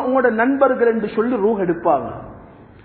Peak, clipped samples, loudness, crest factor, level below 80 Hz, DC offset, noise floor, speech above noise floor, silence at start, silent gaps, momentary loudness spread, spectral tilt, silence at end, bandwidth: -2 dBFS; under 0.1%; -18 LUFS; 16 dB; -50 dBFS; under 0.1%; -42 dBFS; 24 dB; 0 s; none; 6 LU; -12 dB/octave; 0.2 s; 4.5 kHz